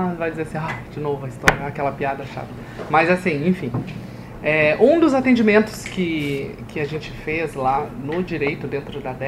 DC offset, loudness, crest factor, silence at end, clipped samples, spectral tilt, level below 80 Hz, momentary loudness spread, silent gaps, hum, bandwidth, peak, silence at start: under 0.1%; -21 LUFS; 20 dB; 0 s; under 0.1%; -6.5 dB/octave; -44 dBFS; 15 LU; none; none; 16 kHz; 0 dBFS; 0 s